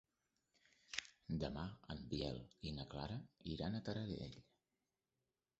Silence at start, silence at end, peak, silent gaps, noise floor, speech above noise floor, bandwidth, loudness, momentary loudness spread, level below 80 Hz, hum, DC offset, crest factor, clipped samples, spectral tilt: 0.9 s; 1.15 s; -18 dBFS; none; under -90 dBFS; over 43 dB; 8 kHz; -48 LUFS; 6 LU; -62 dBFS; none; under 0.1%; 30 dB; under 0.1%; -5 dB/octave